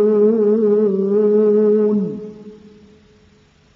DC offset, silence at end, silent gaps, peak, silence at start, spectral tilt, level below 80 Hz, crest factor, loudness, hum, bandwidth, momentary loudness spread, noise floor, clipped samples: under 0.1%; 1.2 s; none; -4 dBFS; 0 s; -11 dB/octave; -64 dBFS; 12 dB; -15 LUFS; none; 3 kHz; 11 LU; -52 dBFS; under 0.1%